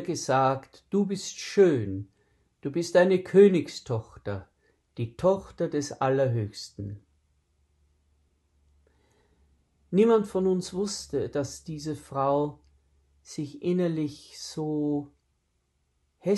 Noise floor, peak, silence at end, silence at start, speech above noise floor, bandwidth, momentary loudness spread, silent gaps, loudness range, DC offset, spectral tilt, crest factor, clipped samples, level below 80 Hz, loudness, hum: -74 dBFS; -8 dBFS; 0 s; 0 s; 48 dB; 12 kHz; 17 LU; none; 8 LU; under 0.1%; -6 dB/octave; 20 dB; under 0.1%; -62 dBFS; -27 LUFS; none